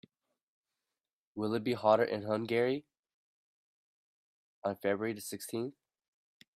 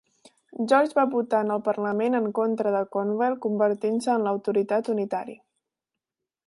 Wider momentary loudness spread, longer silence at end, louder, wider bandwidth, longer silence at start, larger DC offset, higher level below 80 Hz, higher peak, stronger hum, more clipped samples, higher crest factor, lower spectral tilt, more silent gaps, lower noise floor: first, 12 LU vs 6 LU; second, 0.85 s vs 1.15 s; second, -34 LUFS vs -25 LUFS; first, 15.5 kHz vs 11.5 kHz; first, 1.35 s vs 0.6 s; neither; about the same, -78 dBFS vs -78 dBFS; second, -12 dBFS vs -8 dBFS; neither; neither; first, 24 dB vs 18 dB; about the same, -5.5 dB/octave vs -6.5 dB/octave; first, 2.99-3.03 s, 3.14-4.62 s vs none; about the same, under -90 dBFS vs -88 dBFS